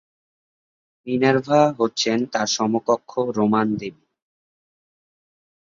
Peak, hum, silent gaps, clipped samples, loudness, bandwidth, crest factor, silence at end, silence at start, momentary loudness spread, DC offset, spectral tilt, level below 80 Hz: -4 dBFS; none; none; under 0.1%; -21 LUFS; 7.6 kHz; 20 dB; 1.85 s; 1.05 s; 10 LU; under 0.1%; -4.5 dB/octave; -64 dBFS